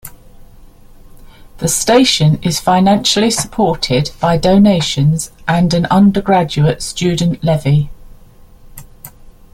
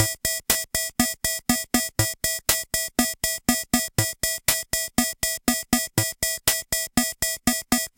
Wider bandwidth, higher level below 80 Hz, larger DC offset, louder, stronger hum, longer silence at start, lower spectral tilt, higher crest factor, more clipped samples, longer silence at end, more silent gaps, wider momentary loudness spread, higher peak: about the same, 16 kHz vs 17.5 kHz; first, -36 dBFS vs -44 dBFS; neither; first, -13 LUFS vs -23 LUFS; neither; about the same, 0.05 s vs 0 s; first, -5 dB/octave vs -2 dB/octave; second, 14 dB vs 22 dB; neither; first, 0.25 s vs 0.1 s; neither; first, 6 LU vs 2 LU; about the same, 0 dBFS vs -2 dBFS